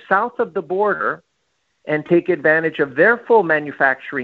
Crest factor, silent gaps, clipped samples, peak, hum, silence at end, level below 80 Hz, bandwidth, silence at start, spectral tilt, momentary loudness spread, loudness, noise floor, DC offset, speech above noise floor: 18 dB; none; under 0.1%; 0 dBFS; none; 0 s; -66 dBFS; 4.8 kHz; 0.1 s; -8.5 dB/octave; 9 LU; -17 LUFS; -69 dBFS; under 0.1%; 52 dB